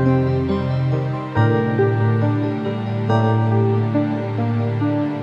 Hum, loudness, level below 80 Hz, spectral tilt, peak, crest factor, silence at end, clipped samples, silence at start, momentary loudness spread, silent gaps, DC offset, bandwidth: none; -19 LUFS; -48 dBFS; -9.5 dB/octave; -4 dBFS; 14 dB; 0 s; under 0.1%; 0 s; 5 LU; none; under 0.1%; 5.6 kHz